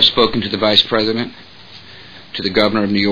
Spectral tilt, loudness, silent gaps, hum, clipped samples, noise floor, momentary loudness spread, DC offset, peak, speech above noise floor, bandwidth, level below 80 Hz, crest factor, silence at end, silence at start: -5.5 dB/octave; -15 LUFS; none; none; under 0.1%; -39 dBFS; 22 LU; 0.7%; 0 dBFS; 23 dB; 5.4 kHz; -44 dBFS; 16 dB; 0 s; 0 s